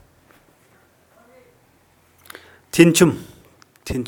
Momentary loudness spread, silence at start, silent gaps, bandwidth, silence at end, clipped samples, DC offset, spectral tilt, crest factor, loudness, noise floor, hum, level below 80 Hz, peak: 29 LU; 2.75 s; none; 19.5 kHz; 0 s; under 0.1%; under 0.1%; -5 dB/octave; 22 dB; -16 LUFS; -57 dBFS; none; -48 dBFS; 0 dBFS